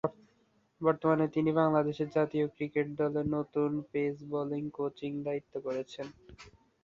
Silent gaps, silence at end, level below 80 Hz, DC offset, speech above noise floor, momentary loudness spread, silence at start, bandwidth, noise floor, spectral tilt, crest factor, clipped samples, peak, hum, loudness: none; 0.35 s; -66 dBFS; under 0.1%; 39 dB; 9 LU; 0.05 s; 7.4 kHz; -70 dBFS; -8.5 dB/octave; 20 dB; under 0.1%; -14 dBFS; none; -32 LUFS